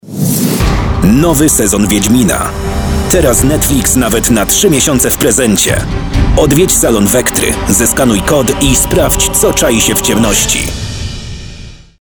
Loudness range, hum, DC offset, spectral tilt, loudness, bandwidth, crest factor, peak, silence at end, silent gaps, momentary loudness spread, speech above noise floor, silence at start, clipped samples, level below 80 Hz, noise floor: 1 LU; none; under 0.1%; -4 dB/octave; -9 LUFS; over 20 kHz; 10 dB; 0 dBFS; 0.4 s; none; 8 LU; 21 dB; 0.05 s; 0.4%; -20 dBFS; -30 dBFS